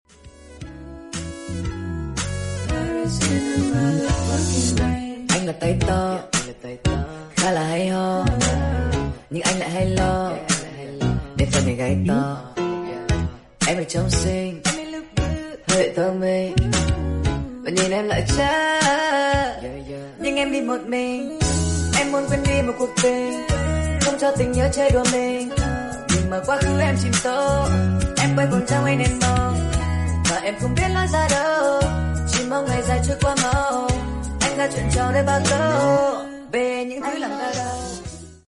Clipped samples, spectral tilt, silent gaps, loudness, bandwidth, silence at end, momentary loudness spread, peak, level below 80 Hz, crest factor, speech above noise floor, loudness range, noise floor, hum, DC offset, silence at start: under 0.1%; -4.5 dB/octave; none; -21 LUFS; 11.5 kHz; 0.1 s; 9 LU; -4 dBFS; -32 dBFS; 18 dB; 24 dB; 3 LU; -44 dBFS; none; under 0.1%; 0.25 s